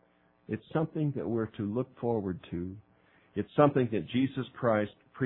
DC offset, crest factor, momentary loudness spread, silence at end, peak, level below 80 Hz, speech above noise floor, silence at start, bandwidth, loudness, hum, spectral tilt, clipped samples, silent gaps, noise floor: under 0.1%; 22 dB; 14 LU; 0 s; -10 dBFS; -64 dBFS; 34 dB; 0.5 s; 4.1 kHz; -32 LUFS; none; -11.5 dB/octave; under 0.1%; none; -64 dBFS